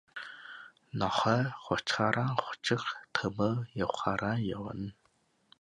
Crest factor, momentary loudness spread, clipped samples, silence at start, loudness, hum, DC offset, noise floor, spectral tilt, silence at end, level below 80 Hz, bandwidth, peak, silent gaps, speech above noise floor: 24 dB; 15 LU; under 0.1%; 0.15 s; -32 LUFS; none; under 0.1%; -72 dBFS; -5.5 dB/octave; 0.7 s; -62 dBFS; 11 kHz; -10 dBFS; none; 40 dB